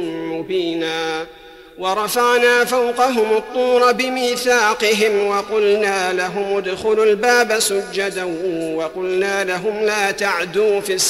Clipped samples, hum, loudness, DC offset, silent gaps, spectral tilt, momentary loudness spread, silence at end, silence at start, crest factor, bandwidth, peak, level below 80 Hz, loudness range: under 0.1%; none; -17 LUFS; under 0.1%; none; -2.5 dB/octave; 8 LU; 0 s; 0 s; 14 dB; 15.5 kHz; -4 dBFS; -56 dBFS; 3 LU